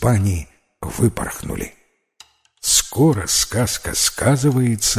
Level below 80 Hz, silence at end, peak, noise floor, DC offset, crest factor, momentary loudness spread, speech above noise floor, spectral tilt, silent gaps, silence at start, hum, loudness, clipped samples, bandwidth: -36 dBFS; 0 s; -2 dBFS; -51 dBFS; under 0.1%; 18 dB; 13 LU; 32 dB; -4 dB/octave; none; 0 s; none; -18 LUFS; under 0.1%; 16 kHz